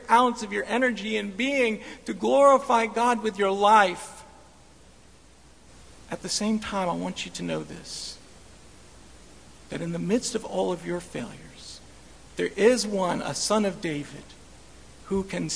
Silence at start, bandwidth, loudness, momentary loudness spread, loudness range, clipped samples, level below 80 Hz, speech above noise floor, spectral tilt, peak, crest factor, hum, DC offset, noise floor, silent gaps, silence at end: 0 s; 11 kHz; -25 LUFS; 20 LU; 10 LU; under 0.1%; -56 dBFS; 29 dB; -4 dB/octave; -6 dBFS; 22 dB; none; 0.2%; -54 dBFS; none; 0 s